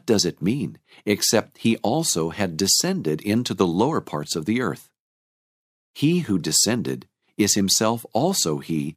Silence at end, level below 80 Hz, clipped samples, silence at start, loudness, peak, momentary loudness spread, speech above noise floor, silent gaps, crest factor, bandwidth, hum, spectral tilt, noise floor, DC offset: 0.05 s; -60 dBFS; under 0.1%; 0.05 s; -22 LUFS; -4 dBFS; 9 LU; over 68 dB; 4.99-5.94 s; 20 dB; 15.5 kHz; none; -3.5 dB/octave; under -90 dBFS; under 0.1%